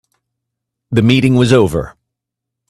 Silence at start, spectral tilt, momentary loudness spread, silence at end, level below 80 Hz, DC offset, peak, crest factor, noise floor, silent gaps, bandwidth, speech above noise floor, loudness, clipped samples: 0.9 s; -6.5 dB/octave; 11 LU; 0.8 s; -40 dBFS; under 0.1%; 0 dBFS; 16 dB; -80 dBFS; none; 13.5 kHz; 69 dB; -12 LUFS; under 0.1%